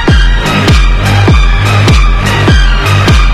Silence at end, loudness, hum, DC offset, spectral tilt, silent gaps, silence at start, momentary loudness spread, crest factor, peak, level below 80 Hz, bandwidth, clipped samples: 0 s; -8 LUFS; none; under 0.1%; -5.5 dB/octave; none; 0 s; 2 LU; 6 dB; 0 dBFS; -8 dBFS; 13 kHz; 0.7%